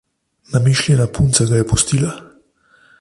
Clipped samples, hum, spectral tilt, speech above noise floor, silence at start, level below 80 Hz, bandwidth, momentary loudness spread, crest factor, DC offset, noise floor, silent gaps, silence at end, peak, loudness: under 0.1%; none; -4.5 dB/octave; 39 dB; 0.5 s; -36 dBFS; 11.5 kHz; 8 LU; 16 dB; under 0.1%; -54 dBFS; none; 0.75 s; 0 dBFS; -15 LUFS